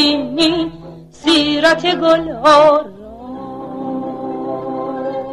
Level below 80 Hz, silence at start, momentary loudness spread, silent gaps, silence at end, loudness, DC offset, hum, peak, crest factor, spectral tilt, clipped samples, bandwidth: -48 dBFS; 0 s; 19 LU; none; 0 s; -15 LUFS; under 0.1%; none; 0 dBFS; 16 dB; -4 dB/octave; under 0.1%; 12 kHz